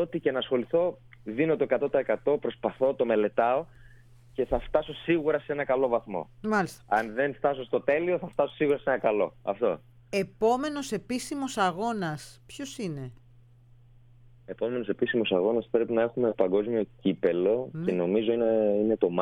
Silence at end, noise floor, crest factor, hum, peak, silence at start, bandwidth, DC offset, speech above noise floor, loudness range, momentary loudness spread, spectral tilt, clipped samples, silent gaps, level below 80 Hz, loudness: 0 s; -55 dBFS; 18 dB; none; -10 dBFS; 0 s; 14.5 kHz; under 0.1%; 28 dB; 6 LU; 9 LU; -6 dB/octave; under 0.1%; none; -54 dBFS; -28 LUFS